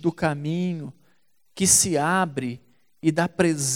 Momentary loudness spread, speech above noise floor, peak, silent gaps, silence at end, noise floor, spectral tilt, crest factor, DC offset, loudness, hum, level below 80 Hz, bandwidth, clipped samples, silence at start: 17 LU; 45 dB; -6 dBFS; none; 0 s; -68 dBFS; -3.5 dB/octave; 18 dB; 0.1%; -22 LUFS; none; -56 dBFS; 17 kHz; under 0.1%; 0 s